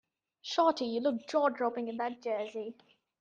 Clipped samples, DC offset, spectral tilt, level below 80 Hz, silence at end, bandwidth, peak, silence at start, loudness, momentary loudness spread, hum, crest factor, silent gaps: under 0.1%; under 0.1%; -4 dB/octave; -82 dBFS; 0.5 s; 8.8 kHz; -14 dBFS; 0.45 s; -32 LUFS; 12 LU; none; 18 dB; none